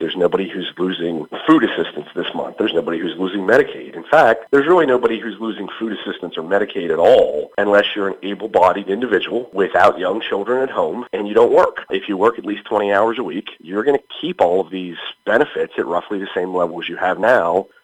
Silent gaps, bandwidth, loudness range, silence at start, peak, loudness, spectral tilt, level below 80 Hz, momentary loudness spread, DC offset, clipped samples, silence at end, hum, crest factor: none; 9.8 kHz; 3 LU; 0 s; 0 dBFS; -18 LUFS; -6 dB/octave; -58 dBFS; 12 LU; under 0.1%; under 0.1%; 0.2 s; none; 18 dB